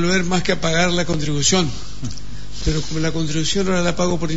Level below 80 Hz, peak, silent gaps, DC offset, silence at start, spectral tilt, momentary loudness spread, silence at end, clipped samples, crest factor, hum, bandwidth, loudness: -34 dBFS; -4 dBFS; none; 7%; 0 s; -4 dB/octave; 14 LU; 0 s; under 0.1%; 16 dB; 50 Hz at -35 dBFS; 8 kHz; -19 LUFS